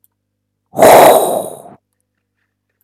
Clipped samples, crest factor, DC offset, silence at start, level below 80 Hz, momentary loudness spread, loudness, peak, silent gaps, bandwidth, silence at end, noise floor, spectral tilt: 1%; 12 dB; under 0.1%; 0.75 s; -48 dBFS; 22 LU; -8 LUFS; 0 dBFS; none; 18.5 kHz; 1.3 s; -71 dBFS; -3.5 dB/octave